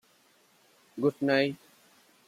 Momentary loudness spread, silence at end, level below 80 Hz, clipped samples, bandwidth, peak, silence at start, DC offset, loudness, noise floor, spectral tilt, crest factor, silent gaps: 21 LU; 0.7 s; -78 dBFS; under 0.1%; 15 kHz; -14 dBFS; 0.95 s; under 0.1%; -28 LUFS; -65 dBFS; -6.5 dB/octave; 20 dB; none